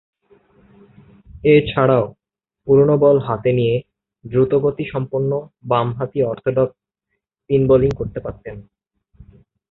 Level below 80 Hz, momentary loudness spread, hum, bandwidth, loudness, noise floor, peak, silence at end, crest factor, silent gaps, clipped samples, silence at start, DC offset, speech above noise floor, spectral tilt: -44 dBFS; 14 LU; none; 4.2 kHz; -18 LUFS; -76 dBFS; -2 dBFS; 1.1 s; 18 dB; none; under 0.1%; 1.35 s; under 0.1%; 60 dB; -10 dB/octave